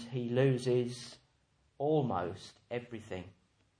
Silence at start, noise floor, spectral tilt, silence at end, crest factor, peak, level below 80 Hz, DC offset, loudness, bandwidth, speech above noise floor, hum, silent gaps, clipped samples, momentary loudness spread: 0 s; -73 dBFS; -7 dB/octave; 0.5 s; 18 dB; -18 dBFS; -72 dBFS; under 0.1%; -34 LUFS; 10.5 kHz; 39 dB; none; none; under 0.1%; 17 LU